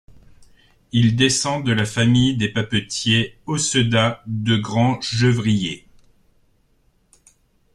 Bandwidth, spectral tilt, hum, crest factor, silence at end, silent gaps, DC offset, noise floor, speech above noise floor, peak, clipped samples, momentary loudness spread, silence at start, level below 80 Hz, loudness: 11.5 kHz; -4.5 dB/octave; none; 18 dB; 1.95 s; none; under 0.1%; -61 dBFS; 42 dB; -2 dBFS; under 0.1%; 6 LU; 0.4 s; -48 dBFS; -19 LUFS